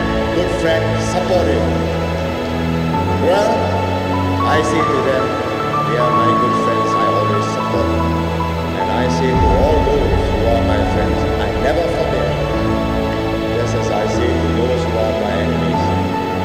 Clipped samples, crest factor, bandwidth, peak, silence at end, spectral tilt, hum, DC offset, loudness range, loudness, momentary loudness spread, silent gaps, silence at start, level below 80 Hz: under 0.1%; 16 dB; 16 kHz; 0 dBFS; 0 s; -6.5 dB/octave; none; under 0.1%; 2 LU; -16 LUFS; 4 LU; none; 0 s; -26 dBFS